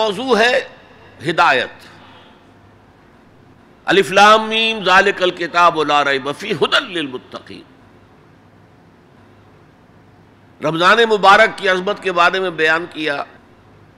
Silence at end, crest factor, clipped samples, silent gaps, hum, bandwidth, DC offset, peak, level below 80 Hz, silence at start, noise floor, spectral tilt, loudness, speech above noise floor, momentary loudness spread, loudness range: 0.75 s; 16 dB; under 0.1%; none; none; 15 kHz; under 0.1%; -2 dBFS; -56 dBFS; 0 s; -47 dBFS; -3.5 dB/octave; -14 LUFS; 33 dB; 16 LU; 10 LU